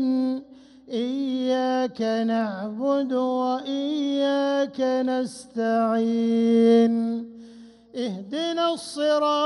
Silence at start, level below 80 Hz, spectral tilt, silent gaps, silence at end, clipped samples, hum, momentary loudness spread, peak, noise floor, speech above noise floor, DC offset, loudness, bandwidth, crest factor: 0 s; -70 dBFS; -5.5 dB/octave; none; 0 s; under 0.1%; none; 11 LU; -10 dBFS; -47 dBFS; 24 dB; under 0.1%; -24 LUFS; 11.5 kHz; 14 dB